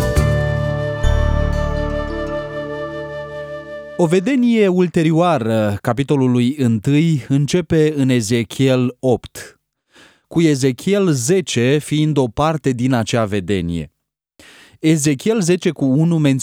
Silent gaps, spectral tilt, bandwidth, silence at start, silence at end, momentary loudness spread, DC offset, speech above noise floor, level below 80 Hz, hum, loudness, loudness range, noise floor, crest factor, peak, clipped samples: none; -6 dB/octave; 16.5 kHz; 0 s; 0 s; 11 LU; under 0.1%; 38 dB; -30 dBFS; none; -17 LUFS; 4 LU; -53 dBFS; 14 dB; -2 dBFS; under 0.1%